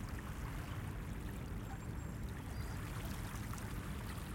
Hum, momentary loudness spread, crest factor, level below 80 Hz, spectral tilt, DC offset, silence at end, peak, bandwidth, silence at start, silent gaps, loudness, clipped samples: none; 1 LU; 12 dB; -48 dBFS; -5.5 dB/octave; under 0.1%; 0 s; -30 dBFS; 17 kHz; 0 s; none; -46 LUFS; under 0.1%